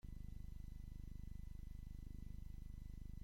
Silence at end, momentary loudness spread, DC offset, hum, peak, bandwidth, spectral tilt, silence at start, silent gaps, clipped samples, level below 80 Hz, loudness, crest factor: 0 s; 1 LU; under 0.1%; 50 Hz at -55 dBFS; -40 dBFS; 16.5 kHz; -7.5 dB/octave; 0.05 s; none; under 0.1%; -52 dBFS; -56 LUFS; 12 dB